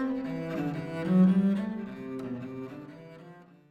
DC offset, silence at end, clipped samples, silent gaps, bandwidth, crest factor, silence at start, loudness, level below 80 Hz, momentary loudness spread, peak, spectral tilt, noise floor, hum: under 0.1%; 0.25 s; under 0.1%; none; 5 kHz; 16 dB; 0 s; -29 LUFS; -66 dBFS; 24 LU; -14 dBFS; -9.5 dB/octave; -52 dBFS; none